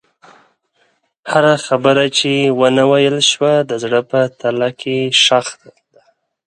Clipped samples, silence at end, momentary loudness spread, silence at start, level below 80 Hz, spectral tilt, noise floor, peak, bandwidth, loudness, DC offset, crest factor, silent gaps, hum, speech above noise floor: under 0.1%; 0.95 s; 7 LU; 1.25 s; -64 dBFS; -3.5 dB/octave; -60 dBFS; 0 dBFS; 11 kHz; -13 LUFS; under 0.1%; 16 dB; none; none; 47 dB